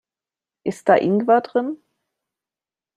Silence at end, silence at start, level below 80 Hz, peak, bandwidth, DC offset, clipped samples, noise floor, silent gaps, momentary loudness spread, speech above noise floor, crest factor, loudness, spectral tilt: 1.2 s; 0.65 s; -68 dBFS; -2 dBFS; 11 kHz; under 0.1%; under 0.1%; under -90 dBFS; none; 13 LU; over 72 dB; 20 dB; -19 LUFS; -7 dB/octave